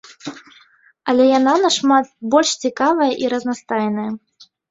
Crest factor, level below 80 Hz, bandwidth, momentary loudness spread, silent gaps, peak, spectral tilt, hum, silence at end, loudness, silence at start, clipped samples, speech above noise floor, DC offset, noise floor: 16 dB; -64 dBFS; 7.8 kHz; 16 LU; none; -2 dBFS; -3.5 dB/octave; none; 0.55 s; -17 LUFS; 0.1 s; under 0.1%; 36 dB; under 0.1%; -52 dBFS